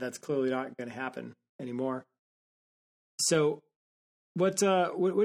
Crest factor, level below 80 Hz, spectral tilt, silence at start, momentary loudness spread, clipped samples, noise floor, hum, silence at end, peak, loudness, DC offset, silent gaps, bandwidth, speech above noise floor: 18 dB; -78 dBFS; -4 dB/octave; 0 s; 17 LU; under 0.1%; under -90 dBFS; none; 0 s; -14 dBFS; -30 LUFS; under 0.1%; 1.49-1.59 s, 2.19-3.18 s, 3.76-4.35 s; 16 kHz; over 60 dB